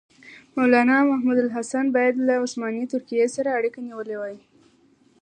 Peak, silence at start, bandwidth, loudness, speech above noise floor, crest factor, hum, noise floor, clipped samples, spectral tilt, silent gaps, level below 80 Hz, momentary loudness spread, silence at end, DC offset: -4 dBFS; 0.25 s; 9.6 kHz; -22 LUFS; 37 dB; 18 dB; none; -59 dBFS; under 0.1%; -4.5 dB/octave; none; -76 dBFS; 14 LU; 0.85 s; under 0.1%